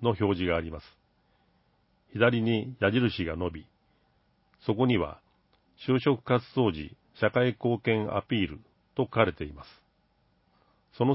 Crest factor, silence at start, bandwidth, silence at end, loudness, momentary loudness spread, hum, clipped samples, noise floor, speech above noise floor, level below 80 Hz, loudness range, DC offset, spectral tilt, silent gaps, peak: 24 dB; 0 s; 5.8 kHz; 0 s; -28 LUFS; 15 LU; none; under 0.1%; -69 dBFS; 42 dB; -52 dBFS; 3 LU; under 0.1%; -10.5 dB/octave; none; -6 dBFS